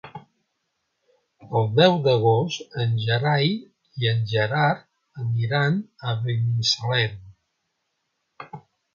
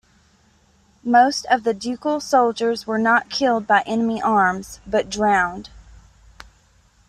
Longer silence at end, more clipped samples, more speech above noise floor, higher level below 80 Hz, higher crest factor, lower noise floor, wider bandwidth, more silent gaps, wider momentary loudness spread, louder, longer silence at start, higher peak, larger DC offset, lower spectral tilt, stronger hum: second, 0.35 s vs 1.3 s; neither; first, 54 dB vs 38 dB; second, -60 dBFS vs -52 dBFS; about the same, 22 dB vs 18 dB; first, -76 dBFS vs -57 dBFS; second, 7.2 kHz vs 14 kHz; neither; first, 14 LU vs 8 LU; second, -22 LUFS vs -19 LUFS; second, 0.05 s vs 1.05 s; about the same, -2 dBFS vs -4 dBFS; neither; first, -5.5 dB/octave vs -4 dB/octave; neither